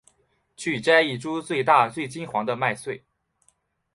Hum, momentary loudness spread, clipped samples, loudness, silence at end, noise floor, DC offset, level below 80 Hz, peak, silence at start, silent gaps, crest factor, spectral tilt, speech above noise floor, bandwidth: none; 14 LU; under 0.1%; -23 LUFS; 0.95 s; -67 dBFS; under 0.1%; -66 dBFS; -4 dBFS; 0.6 s; none; 22 dB; -4.5 dB/octave; 44 dB; 11.5 kHz